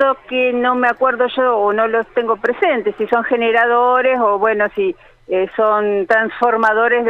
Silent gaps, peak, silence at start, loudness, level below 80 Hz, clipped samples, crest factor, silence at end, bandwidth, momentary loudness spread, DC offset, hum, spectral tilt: none; -2 dBFS; 0 s; -15 LUFS; -54 dBFS; under 0.1%; 12 dB; 0 s; 6.4 kHz; 6 LU; under 0.1%; none; -6 dB/octave